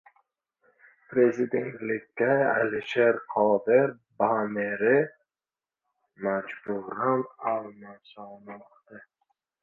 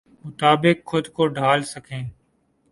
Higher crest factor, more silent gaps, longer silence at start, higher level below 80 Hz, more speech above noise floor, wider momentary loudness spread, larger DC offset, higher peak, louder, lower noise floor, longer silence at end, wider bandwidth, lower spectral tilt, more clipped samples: about the same, 20 dB vs 22 dB; neither; first, 1.1 s vs 0.25 s; second, -76 dBFS vs -58 dBFS; first, over 64 dB vs 44 dB; first, 21 LU vs 16 LU; neither; second, -8 dBFS vs 0 dBFS; second, -26 LUFS vs -20 LUFS; first, under -90 dBFS vs -65 dBFS; about the same, 0.65 s vs 0.6 s; second, 7 kHz vs 11.5 kHz; first, -7.5 dB/octave vs -5.5 dB/octave; neither